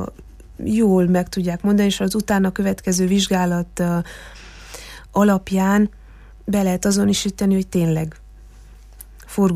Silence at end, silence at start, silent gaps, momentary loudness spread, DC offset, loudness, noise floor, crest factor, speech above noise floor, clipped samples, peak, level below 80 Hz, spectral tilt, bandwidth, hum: 0 s; 0 s; none; 16 LU; under 0.1%; -19 LUFS; -42 dBFS; 16 dB; 24 dB; under 0.1%; -4 dBFS; -42 dBFS; -5.5 dB/octave; 15.5 kHz; none